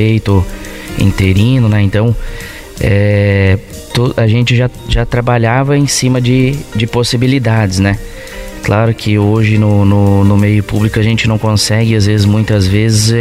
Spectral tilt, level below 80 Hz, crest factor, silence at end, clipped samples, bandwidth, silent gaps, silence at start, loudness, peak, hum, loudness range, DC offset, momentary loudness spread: -6 dB/octave; -28 dBFS; 10 dB; 0 s; under 0.1%; 15 kHz; none; 0 s; -11 LUFS; 0 dBFS; none; 2 LU; under 0.1%; 8 LU